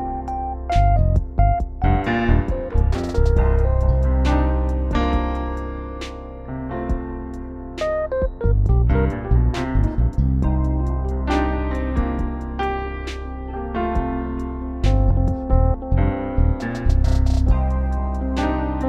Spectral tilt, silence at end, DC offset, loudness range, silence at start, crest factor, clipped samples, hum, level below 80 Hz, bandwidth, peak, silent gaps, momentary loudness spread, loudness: -8 dB/octave; 0 s; under 0.1%; 5 LU; 0 s; 16 dB; under 0.1%; none; -22 dBFS; 7.6 kHz; -4 dBFS; none; 10 LU; -22 LUFS